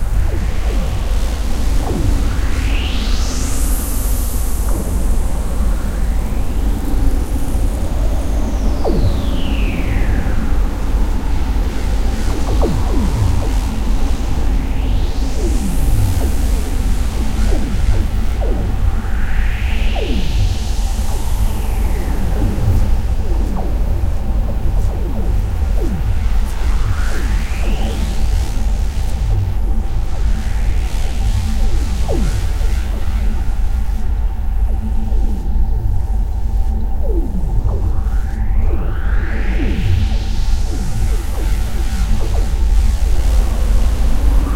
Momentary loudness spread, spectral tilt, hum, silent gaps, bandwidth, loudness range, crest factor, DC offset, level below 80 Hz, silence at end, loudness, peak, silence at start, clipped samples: 4 LU; -6 dB/octave; none; none; 15.5 kHz; 1 LU; 12 dB; under 0.1%; -16 dBFS; 0 s; -20 LUFS; 0 dBFS; 0 s; under 0.1%